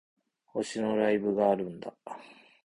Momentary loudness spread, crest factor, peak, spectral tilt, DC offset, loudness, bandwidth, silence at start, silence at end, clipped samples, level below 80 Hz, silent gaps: 18 LU; 18 dB; -12 dBFS; -6 dB/octave; under 0.1%; -29 LUFS; 11 kHz; 0.55 s; 0.3 s; under 0.1%; -70 dBFS; none